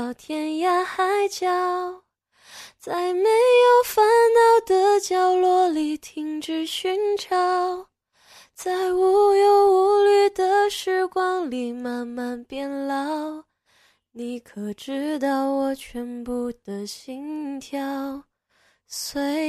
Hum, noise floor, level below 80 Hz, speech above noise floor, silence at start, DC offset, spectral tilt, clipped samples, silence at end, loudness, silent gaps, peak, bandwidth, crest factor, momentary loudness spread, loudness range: none; -64 dBFS; -62 dBFS; 43 dB; 0 s; under 0.1%; -3 dB/octave; under 0.1%; 0 s; -21 LUFS; none; -8 dBFS; 14 kHz; 14 dB; 17 LU; 12 LU